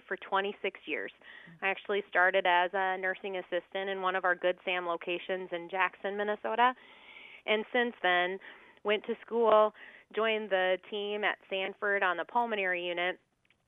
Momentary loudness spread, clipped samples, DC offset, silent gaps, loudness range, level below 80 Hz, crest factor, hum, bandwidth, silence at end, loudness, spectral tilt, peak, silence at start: 11 LU; under 0.1%; under 0.1%; none; 3 LU; -82 dBFS; 20 dB; none; 4.3 kHz; 0.5 s; -31 LUFS; -6.5 dB/octave; -12 dBFS; 0.1 s